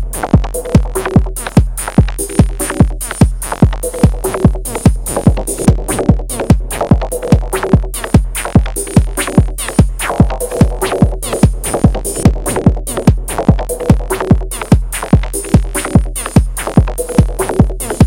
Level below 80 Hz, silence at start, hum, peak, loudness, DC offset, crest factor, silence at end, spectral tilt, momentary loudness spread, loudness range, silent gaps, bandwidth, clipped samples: -18 dBFS; 0 s; none; 0 dBFS; -13 LUFS; under 0.1%; 12 dB; 0 s; -6 dB/octave; 1 LU; 0 LU; none; 17.5 kHz; 1%